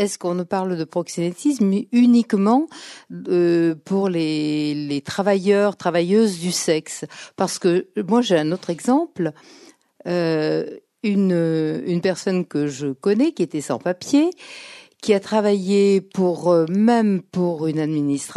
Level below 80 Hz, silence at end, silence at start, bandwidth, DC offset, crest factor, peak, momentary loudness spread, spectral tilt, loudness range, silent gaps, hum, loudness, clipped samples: -70 dBFS; 0 s; 0 s; 12.5 kHz; under 0.1%; 16 dB; -4 dBFS; 9 LU; -6 dB/octave; 3 LU; none; none; -20 LUFS; under 0.1%